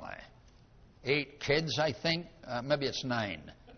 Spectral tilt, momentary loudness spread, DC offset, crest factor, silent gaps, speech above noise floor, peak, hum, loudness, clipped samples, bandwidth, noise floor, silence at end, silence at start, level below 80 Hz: -3 dB/octave; 12 LU; under 0.1%; 20 dB; none; 26 dB; -14 dBFS; none; -33 LUFS; under 0.1%; 6.6 kHz; -59 dBFS; 0 s; 0 s; -60 dBFS